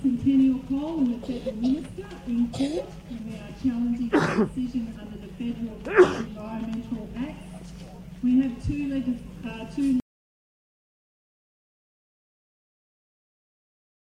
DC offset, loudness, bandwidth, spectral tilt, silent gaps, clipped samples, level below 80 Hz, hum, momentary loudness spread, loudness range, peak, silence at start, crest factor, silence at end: under 0.1%; -26 LUFS; 10.5 kHz; -7 dB/octave; none; under 0.1%; -48 dBFS; none; 17 LU; 7 LU; -4 dBFS; 0 s; 22 dB; 4.05 s